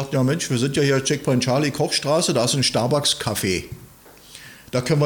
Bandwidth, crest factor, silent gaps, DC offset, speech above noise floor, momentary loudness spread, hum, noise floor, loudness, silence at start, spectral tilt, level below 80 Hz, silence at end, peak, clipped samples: 19.5 kHz; 14 dB; none; under 0.1%; 26 dB; 16 LU; none; -46 dBFS; -20 LUFS; 0 s; -4.5 dB/octave; -52 dBFS; 0 s; -8 dBFS; under 0.1%